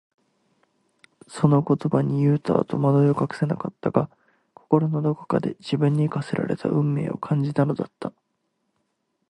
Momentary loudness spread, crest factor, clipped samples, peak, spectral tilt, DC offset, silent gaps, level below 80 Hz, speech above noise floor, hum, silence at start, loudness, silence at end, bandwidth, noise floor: 7 LU; 20 dB; under 0.1%; -2 dBFS; -9 dB/octave; under 0.1%; none; -62 dBFS; 52 dB; none; 1.3 s; -23 LUFS; 1.2 s; 9.8 kHz; -74 dBFS